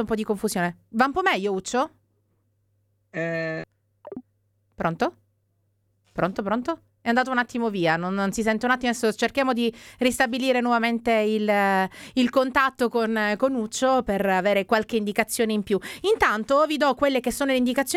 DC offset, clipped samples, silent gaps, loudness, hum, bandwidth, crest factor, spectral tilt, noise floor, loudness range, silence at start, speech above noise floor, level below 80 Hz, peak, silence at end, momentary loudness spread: under 0.1%; under 0.1%; none; -23 LUFS; none; 16 kHz; 20 dB; -4.5 dB/octave; -70 dBFS; 9 LU; 0 s; 47 dB; -54 dBFS; -6 dBFS; 0 s; 8 LU